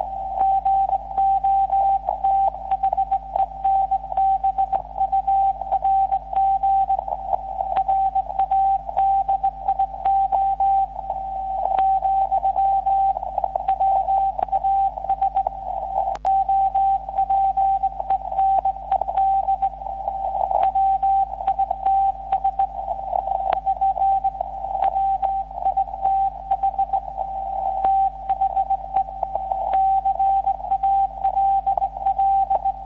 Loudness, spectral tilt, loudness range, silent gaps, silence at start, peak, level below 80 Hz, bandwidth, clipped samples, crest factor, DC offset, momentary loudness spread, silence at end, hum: -21 LUFS; -4.5 dB/octave; 2 LU; none; 0 s; -4 dBFS; -42 dBFS; 4 kHz; under 0.1%; 16 dB; under 0.1%; 6 LU; 0 s; none